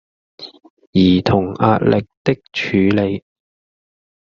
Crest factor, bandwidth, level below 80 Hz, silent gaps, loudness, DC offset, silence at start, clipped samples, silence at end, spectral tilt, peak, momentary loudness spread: 16 dB; 7 kHz; -50 dBFS; 0.70-0.77 s, 0.87-0.93 s, 2.17-2.25 s; -16 LUFS; under 0.1%; 0.4 s; under 0.1%; 1.15 s; -5.5 dB/octave; -2 dBFS; 22 LU